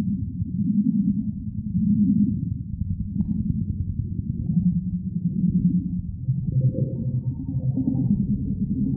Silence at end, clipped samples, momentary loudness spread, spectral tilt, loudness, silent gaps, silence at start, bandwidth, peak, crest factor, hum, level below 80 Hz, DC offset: 0 s; under 0.1%; 8 LU; -17.5 dB/octave; -25 LUFS; none; 0 s; 1 kHz; -10 dBFS; 14 dB; none; -38 dBFS; under 0.1%